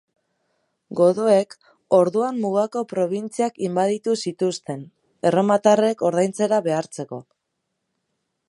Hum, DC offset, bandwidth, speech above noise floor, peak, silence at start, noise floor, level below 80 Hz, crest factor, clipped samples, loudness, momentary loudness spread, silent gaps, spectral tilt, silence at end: none; under 0.1%; 11.5 kHz; 57 dB; -2 dBFS; 0.9 s; -77 dBFS; -74 dBFS; 20 dB; under 0.1%; -21 LUFS; 14 LU; none; -6 dB/octave; 1.3 s